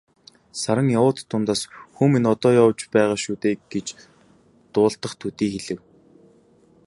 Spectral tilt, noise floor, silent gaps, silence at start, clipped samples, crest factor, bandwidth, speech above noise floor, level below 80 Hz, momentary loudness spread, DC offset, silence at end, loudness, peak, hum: -6 dB/octave; -56 dBFS; none; 0.55 s; under 0.1%; 20 dB; 11.5 kHz; 35 dB; -60 dBFS; 13 LU; under 0.1%; 1.1 s; -21 LUFS; -4 dBFS; none